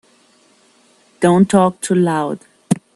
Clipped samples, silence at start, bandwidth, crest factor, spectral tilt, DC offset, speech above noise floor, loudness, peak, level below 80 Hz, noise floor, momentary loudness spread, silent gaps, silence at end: under 0.1%; 1.2 s; 12.5 kHz; 18 dB; -6.5 dB/octave; under 0.1%; 39 dB; -16 LUFS; 0 dBFS; -56 dBFS; -53 dBFS; 11 LU; none; 0.15 s